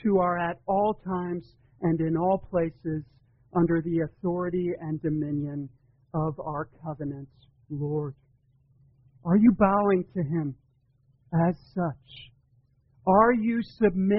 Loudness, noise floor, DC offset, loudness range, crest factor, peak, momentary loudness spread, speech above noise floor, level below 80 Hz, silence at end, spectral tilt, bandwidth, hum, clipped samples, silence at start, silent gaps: -27 LUFS; -65 dBFS; under 0.1%; 7 LU; 20 dB; -8 dBFS; 15 LU; 39 dB; -54 dBFS; 0 s; -8 dB/octave; 5.6 kHz; none; under 0.1%; 0.05 s; none